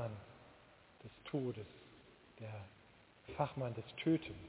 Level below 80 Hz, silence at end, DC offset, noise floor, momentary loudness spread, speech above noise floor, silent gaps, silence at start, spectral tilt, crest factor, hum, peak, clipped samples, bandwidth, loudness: -68 dBFS; 0 s; under 0.1%; -64 dBFS; 26 LU; 23 dB; none; 0 s; -6 dB/octave; 22 dB; none; -22 dBFS; under 0.1%; 4 kHz; -43 LUFS